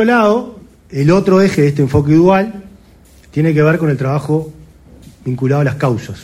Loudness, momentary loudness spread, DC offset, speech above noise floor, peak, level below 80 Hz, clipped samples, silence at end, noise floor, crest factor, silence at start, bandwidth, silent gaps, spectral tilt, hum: -13 LUFS; 14 LU; under 0.1%; 31 dB; 0 dBFS; -42 dBFS; under 0.1%; 0 s; -43 dBFS; 14 dB; 0 s; 13 kHz; none; -8 dB/octave; none